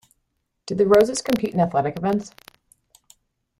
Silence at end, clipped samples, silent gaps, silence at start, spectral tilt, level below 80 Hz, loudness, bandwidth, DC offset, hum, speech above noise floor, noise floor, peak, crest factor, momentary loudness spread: 1.3 s; under 0.1%; none; 0.65 s; -5.5 dB/octave; -56 dBFS; -21 LUFS; 16 kHz; under 0.1%; none; 54 dB; -74 dBFS; -4 dBFS; 20 dB; 15 LU